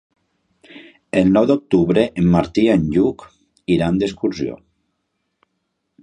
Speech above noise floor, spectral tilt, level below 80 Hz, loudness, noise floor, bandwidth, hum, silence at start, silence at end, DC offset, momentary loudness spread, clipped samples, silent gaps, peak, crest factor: 57 dB; -8 dB/octave; -44 dBFS; -17 LUFS; -73 dBFS; 9.8 kHz; none; 0.75 s; 1.45 s; under 0.1%; 10 LU; under 0.1%; none; -2 dBFS; 18 dB